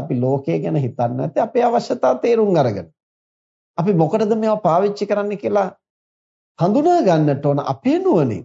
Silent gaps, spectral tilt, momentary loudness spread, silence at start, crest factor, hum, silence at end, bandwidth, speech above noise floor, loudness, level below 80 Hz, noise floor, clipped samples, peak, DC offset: 3.03-3.74 s, 5.90-6.55 s; -8 dB/octave; 6 LU; 0 s; 14 dB; none; 0 s; 7.8 kHz; over 73 dB; -18 LUFS; -66 dBFS; under -90 dBFS; under 0.1%; -4 dBFS; under 0.1%